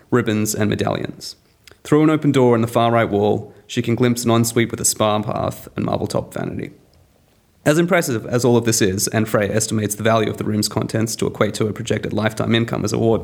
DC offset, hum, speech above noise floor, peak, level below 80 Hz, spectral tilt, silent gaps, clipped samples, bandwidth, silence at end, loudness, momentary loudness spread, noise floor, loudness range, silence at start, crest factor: under 0.1%; none; 38 dB; 0 dBFS; -52 dBFS; -5 dB/octave; none; under 0.1%; over 20 kHz; 0 s; -19 LUFS; 10 LU; -56 dBFS; 4 LU; 0.1 s; 18 dB